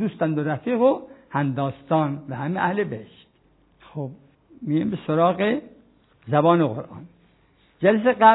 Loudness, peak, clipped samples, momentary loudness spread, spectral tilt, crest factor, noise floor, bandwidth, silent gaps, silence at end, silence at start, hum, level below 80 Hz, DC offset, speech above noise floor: -23 LUFS; -2 dBFS; under 0.1%; 16 LU; -11 dB/octave; 22 dB; -60 dBFS; 4.1 kHz; none; 0 s; 0 s; none; -64 dBFS; under 0.1%; 39 dB